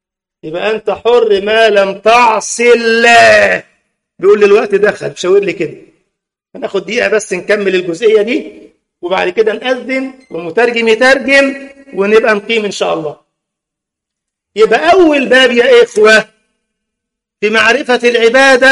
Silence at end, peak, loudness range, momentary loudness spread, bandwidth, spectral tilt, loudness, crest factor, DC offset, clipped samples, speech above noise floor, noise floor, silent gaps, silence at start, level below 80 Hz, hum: 0 s; 0 dBFS; 6 LU; 12 LU; 11.5 kHz; -3 dB/octave; -9 LUFS; 10 dB; under 0.1%; 0.2%; 70 dB; -79 dBFS; none; 0.45 s; -50 dBFS; none